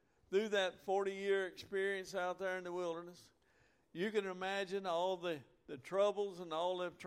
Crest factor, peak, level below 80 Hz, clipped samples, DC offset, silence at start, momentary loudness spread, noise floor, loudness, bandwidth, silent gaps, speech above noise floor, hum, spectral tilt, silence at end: 18 dB; -22 dBFS; -80 dBFS; under 0.1%; under 0.1%; 0.3 s; 8 LU; -74 dBFS; -39 LUFS; 15 kHz; none; 34 dB; none; -4.5 dB/octave; 0 s